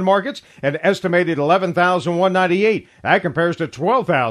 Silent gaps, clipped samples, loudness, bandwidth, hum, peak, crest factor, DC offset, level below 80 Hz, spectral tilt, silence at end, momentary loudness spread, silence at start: none; under 0.1%; -18 LUFS; 11 kHz; none; 0 dBFS; 18 dB; under 0.1%; -60 dBFS; -6.5 dB/octave; 0 s; 6 LU; 0 s